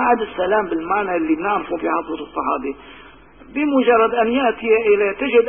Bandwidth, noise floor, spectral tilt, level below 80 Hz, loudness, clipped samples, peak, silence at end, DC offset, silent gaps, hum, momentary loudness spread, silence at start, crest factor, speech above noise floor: 3.6 kHz; -44 dBFS; -10 dB/octave; -50 dBFS; -18 LUFS; under 0.1%; -4 dBFS; 0 s; 0.2%; none; none; 9 LU; 0 s; 14 dB; 26 dB